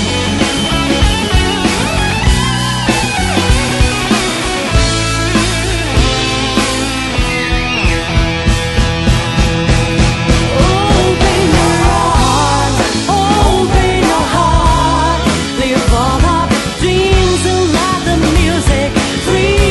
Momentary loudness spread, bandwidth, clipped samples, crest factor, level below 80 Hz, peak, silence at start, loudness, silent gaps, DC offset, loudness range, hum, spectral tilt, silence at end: 3 LU; 12 kHz; under 0.1%; 12 dB; -18 dBFS; 0 dBFS; 0 s; -12 LUFS; none; under 0.1%; 2 LU; none; -4.5 dB/octave; 0 s